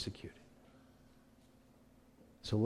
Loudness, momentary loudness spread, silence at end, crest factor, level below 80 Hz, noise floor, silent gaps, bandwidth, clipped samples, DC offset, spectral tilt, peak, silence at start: -45 LUFS; 20 LU; 0 s; 22 dB; -66 dBFS; -65 dBFS; none; 12.5 kHz; under 0.1%; under 0.1%; -6.5 dB/octave; -22 dBFS; 0 s